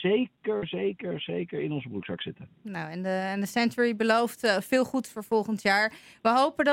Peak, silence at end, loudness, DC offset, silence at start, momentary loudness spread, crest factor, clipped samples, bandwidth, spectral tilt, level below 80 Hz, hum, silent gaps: -10 dBFS; 0 s; -28 LUFS; under 0.1%; 0 s; 12 LU; 18 dB; under 0.1%; 17 kHz; -5 dB/octave; -68 dBFS; none; none